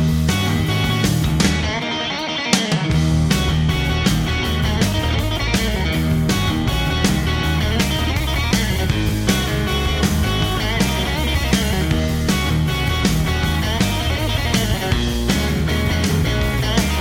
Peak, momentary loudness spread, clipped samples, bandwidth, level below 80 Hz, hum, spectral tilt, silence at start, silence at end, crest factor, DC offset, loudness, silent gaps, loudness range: 0 dBFS; 2 LU; under 0.1%; 17 kHz; -24 dBFS; none; -5 dB/octave; 0 s; 0 s; 18 dB; under 0.1%; -18 LUFS; none; 1 LU